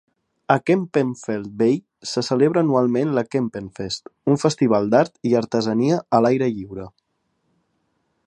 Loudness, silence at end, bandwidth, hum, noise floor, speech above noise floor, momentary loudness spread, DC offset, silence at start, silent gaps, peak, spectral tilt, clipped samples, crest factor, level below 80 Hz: -20 LUFS; 1.4 s; 10.5 kHz; none; -71 dBFS; 51 dB; 11 LU; under 0.1%; 0.5 s; none; -2 dBFS; -6.5 dB/octave; under 0.1%; 20 dB; -60 dBFS